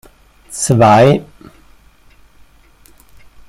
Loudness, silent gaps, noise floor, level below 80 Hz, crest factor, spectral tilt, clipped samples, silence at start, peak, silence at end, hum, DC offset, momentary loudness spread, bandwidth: -11 LUFS; none; -46 dBFS; -46 dBFS; 16 dB; -5.5 dB/octave; under 0.1%; 0.5 s; 0 dBFS; 2.25 s; none; under 0.1%; 14 LU; 16 kHz